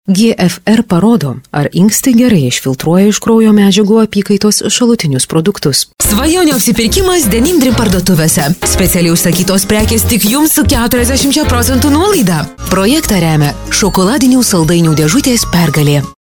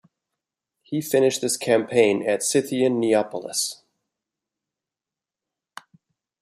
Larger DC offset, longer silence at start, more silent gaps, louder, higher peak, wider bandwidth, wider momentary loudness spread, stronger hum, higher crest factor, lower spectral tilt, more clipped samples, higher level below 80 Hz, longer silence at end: neither; second, 0.05 s vs 0.9 s; neither; first, -9 LUFS vs -22 LUFS; first, 0 dBFS vs -4 dBFS; first, 19.5 kHz vs 15 kHz; second, 4 LU vs 7 LU; neither; second, 10 dB vs 20 dB; about the same, -4.5 dB/octave vs -3.5 dB/octave; neither; first, -26 dBFS vs -72 dBFS; second, 0.2 s vs 2.65 s